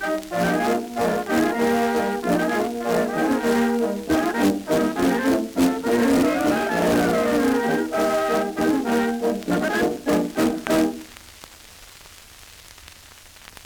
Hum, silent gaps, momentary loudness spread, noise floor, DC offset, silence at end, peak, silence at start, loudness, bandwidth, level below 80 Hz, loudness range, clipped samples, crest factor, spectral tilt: none; none; 4 LU; -46 dBFS; under 0.1%; 0.35 s; -4 dBFS; 0 s; -21 LUFS; over 20 kHz; -50 dBFS; 5 LU; under 0.1%; 18 dB; -5 dB/octave